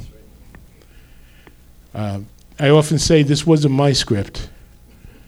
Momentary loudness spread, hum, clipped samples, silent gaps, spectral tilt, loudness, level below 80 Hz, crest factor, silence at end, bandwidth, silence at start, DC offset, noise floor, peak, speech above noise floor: 18 LU; 60 Hz at -50 dBFS; under 0.1%; none; -5.5 dB/octave; -16 LUFS; -40 dBFS; 18 dB; 0.2 s; 14 kHz; 0 s; under 0.1%; -45 dBFS; 0 dBFS; 30 dB